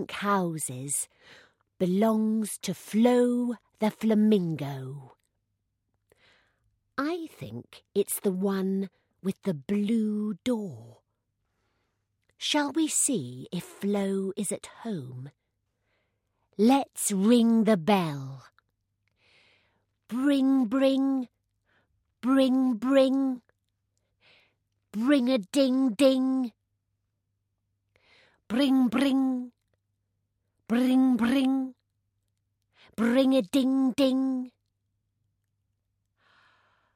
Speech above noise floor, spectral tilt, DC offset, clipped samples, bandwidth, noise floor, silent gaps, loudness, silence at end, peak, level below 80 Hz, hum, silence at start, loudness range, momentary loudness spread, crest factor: 54 dB; -5 dB/octave; under 0.1%; under 0.1%; 16 kHz; -79 dBFS; none; -26 LUFS; 2.45 s; -10 dBFS; -72 dBFS; none; 0 s; 6 LU; 15 LU; 18 dB